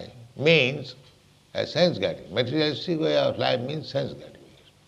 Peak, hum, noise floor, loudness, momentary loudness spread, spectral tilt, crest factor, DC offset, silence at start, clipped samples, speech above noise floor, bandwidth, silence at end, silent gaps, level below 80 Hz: -6 dBFS; none; -56 dBFS; -24 LUFS; 16 LU; -6 dB/octave; 20 dB; under 0.1%; 0 s; under 0.1%; 32 dB; 10.5 kHz; 0.45 s; none; -62 dBFS